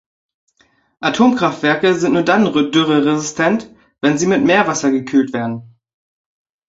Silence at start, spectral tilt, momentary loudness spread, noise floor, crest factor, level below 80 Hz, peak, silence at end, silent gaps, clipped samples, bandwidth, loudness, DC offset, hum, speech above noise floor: 1 s; -4.5 dB/octave; 8 LU; -58 dBFS; 16 dB; -56 dBFS; -2 dBFS; 1 s; none; under 0.1%; 8 kHz; -15 LUFS; under 0.1%; none; 44 dB